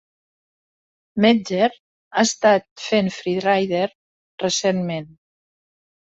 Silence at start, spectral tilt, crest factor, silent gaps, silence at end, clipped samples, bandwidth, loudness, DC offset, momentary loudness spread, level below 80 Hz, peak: 1.15 s; -4 dB/octave; 20 dB; 1.80-2.11 s, 2.71-2.76 s, 3.95-4.38 s; 1.05 s; under 0.1%; 8.2 kHz; -20 LUFS; under 0.1%; 10 LU; -64 dBFS; -2 dBFS